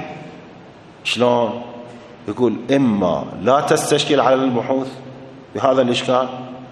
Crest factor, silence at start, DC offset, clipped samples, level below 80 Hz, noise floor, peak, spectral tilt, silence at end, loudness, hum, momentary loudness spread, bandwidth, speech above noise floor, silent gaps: 18 dB; 0 s; under 0.1%; under 0.1%; -58 dBFS; -41 dBFS; 0 dBFS; -5 dB/octave; 0 s; -18 LUFS; none; 20 LU; 12.5 kHz; 24 dB; none